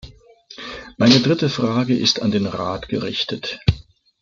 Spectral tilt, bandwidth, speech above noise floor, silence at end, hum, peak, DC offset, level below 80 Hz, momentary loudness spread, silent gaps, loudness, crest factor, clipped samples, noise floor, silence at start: -5 dB/octave; 7.4 kHz; 27 dB; 0.4 s; none; -2 dBFS; under 0.1%; -42 dBFS; 18 LU; none; -19 LUFS; 18 dB; under 0.1%; -45 dBFS; 0.05 s